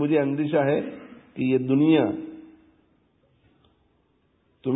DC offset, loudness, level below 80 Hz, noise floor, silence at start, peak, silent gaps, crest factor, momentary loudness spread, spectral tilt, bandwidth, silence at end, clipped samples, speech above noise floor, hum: under 0.1%; -23 LUFS; -66 dBFS; -66 dBFS; 0 s; -8 dBFS; none; 16 dB; 22 LU; -11.5 dB/octave; 4 kHz; 0 s; under 0.1%; 45 dB; none